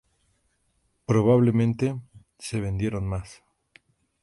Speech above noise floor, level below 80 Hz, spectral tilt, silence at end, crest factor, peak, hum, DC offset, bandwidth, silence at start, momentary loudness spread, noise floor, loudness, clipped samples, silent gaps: 47 dB; -48 dBFS; -8 dB/octave; 0.9 s; 18 dB; -8 dBFS; none; under 0.1%; 11.5 kHz; 1.1 s; 19 LU; -70 dBFS; -24 LUFS; under 0.1%; none